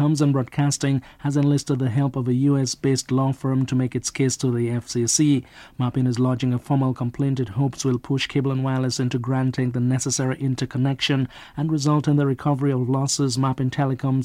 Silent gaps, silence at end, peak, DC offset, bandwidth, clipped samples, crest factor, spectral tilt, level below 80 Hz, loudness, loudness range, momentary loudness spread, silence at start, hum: none; 0 s; -8 dBFS; under 0.1%; 13.5 kHz; under 0.1%; 14 dB; -5.5 dB/octave; -54 dBFS; -22 LUFS; 1 LU; 5 LU; 0 s; none